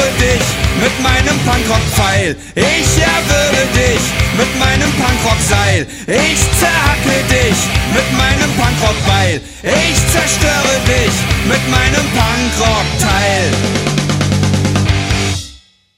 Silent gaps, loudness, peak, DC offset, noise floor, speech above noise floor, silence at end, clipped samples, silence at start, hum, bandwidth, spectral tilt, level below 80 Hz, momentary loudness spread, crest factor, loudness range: none; -12 LUFS; 0 dBFS; under 0.1%; -40 dBFS; 28 dB; 0.4 s; under 0.1%; 0 s; none; 16.5 kHz; -4 dB/octave; -22 dBFS; 3 LU; 12 dB; 1 LU